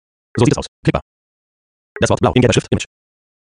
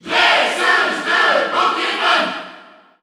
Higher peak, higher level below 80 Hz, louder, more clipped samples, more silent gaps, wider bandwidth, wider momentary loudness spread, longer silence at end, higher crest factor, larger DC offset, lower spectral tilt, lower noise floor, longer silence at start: about the same, 0 dBFS vs -2 dBFS; first, -40 dBFS vs -66 dBFS; about the same, -17 LUFS vs -15 LUFS; neither; first, 0.68-0.83 s, 1.02-1.95 s vs none; second, 10.5 kHz vs over 20 kHz; first, 12 LU vs 8 LU; first, 0.7 s vs 0.4 s; about the same, 18 dB vs 16 dB; neither; first, -5.5 dB/octave vs -1.5 dB/octave; first, under -90 dBFS vs -43 dBFS; first, 0.35 s vs 0.05 s